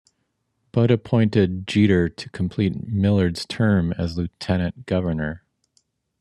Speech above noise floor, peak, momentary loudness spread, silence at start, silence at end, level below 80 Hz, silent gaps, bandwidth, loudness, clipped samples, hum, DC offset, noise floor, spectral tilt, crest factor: 52 dB; -4 dBFS; 9 LU; 0.75 s; 0.85 s; -50 dBFS; none; 11 kHz; -22 LUFS; under 0.1%; none; under 0.1%; -73 dBFS; -7.5 dB/octave; 18 dB